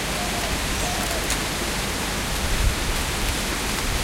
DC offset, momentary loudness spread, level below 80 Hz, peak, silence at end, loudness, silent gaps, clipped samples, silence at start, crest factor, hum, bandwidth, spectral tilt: under 0.1%; 1 LU; -30 dBFS; -8 dBFS; 0 s; -24 LUFS; none; under 0.1%; 0 s; 18 dB; none; 17 kHz; -3 dB/octave